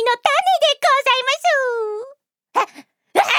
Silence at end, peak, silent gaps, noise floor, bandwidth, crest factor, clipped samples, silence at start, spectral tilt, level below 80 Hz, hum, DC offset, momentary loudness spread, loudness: 0 s; 0 dBFS; none; -46 dBFS; 19 kHz; 18 dB; under 0.1%; 0 s; 0.5 dB/octave; -76 dBFS; none; under 0.1%; 12 LU; -17 LUFS